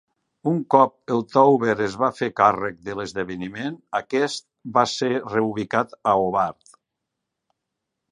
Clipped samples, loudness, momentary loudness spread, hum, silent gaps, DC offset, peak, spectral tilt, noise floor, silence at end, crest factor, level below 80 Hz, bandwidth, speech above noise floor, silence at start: under 0.1%; -22 LUFS; 12 LU; none; none; under 0.1%; -2 dBFS; -5.5 dB/octave; -82 dBFS; 1.6 s; 22 dB; -60 dBFS; 11 kHz; 60 dB; 0.45 s